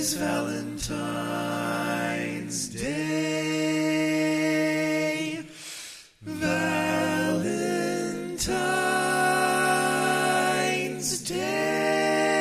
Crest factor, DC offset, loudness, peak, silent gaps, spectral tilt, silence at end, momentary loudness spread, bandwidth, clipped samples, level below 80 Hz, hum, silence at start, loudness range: 16 dB; under 0.1%; -26 LUFS; -10 dBFS; none; -3.5 dB/octave; 0 s; 8 LU; 15.5 kHz; under 0.1%; -54 dBFS; none; 0 s; 4 LU